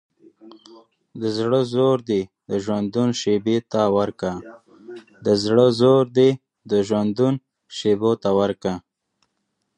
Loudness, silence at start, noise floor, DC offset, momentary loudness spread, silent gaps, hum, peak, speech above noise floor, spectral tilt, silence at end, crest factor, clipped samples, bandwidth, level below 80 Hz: -20 LUFS; 0.45 s; -74 dBFS; under 0.1%; 13 LU; none; none; -4 dBFS; 55 dB; -6.5 dB/octave; 1 s; 18 dB; under 0.1%; 10.5 kHz; -58 dBFS